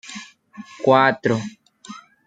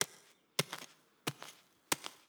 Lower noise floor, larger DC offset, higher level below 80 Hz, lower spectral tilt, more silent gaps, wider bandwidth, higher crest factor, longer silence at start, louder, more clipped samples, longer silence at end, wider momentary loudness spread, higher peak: second, -42 dBFS vs -63 dBFS; neither; first, -66 dBFS vs -86 dBFS; first, -5.5 dB/octave vs -2 dB/octave; neither; second, 9.2 kHz vs over 20 kHz; second, 20 dB vs 34 dB; about the same, 0.05 s vs 0 s; first, -18 LUFS vs -40 LUFS; neither; about the same, 0.25 s vs 0.15 s; first, 25 LU vs 16 LU; first, -2 dBFS vs -8 dBFS